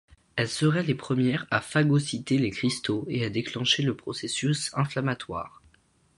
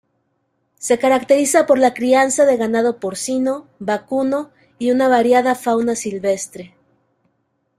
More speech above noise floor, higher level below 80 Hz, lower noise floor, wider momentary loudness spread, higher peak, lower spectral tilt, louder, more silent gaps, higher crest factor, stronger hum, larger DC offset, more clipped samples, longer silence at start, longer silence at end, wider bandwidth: second, 37 dB vs 52 dB; about the same, -60 dBFS vs -62 dBFS; second, -63 dBFS vs -68 dBFS; about the same, 8 LU vs 10 LU; second, -8 dBFS vs -2 dBFS; first, -5 dB/octave vs -3.5 dB/octave; second, -27 LUFS vs -17 LUFS; neither; about the same, 20 dB vs 16 dB; neither; neither; neither; second, 0.35 s vs 0.8 s; second, 0.7 s vs 1.1 s; second, 11.5 kHz vs 15 kHz